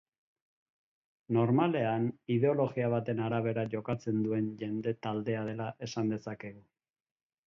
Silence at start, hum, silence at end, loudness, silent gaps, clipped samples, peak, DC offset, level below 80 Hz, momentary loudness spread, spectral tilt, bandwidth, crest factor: 1.3 s; none; 0.85 s; -32 LUFS; none; under 0.1%; -16 dBFS; under 0.1%; -70 dBFS; 10 LU; -8 dB/octave; 7.2 kHz; 18 dB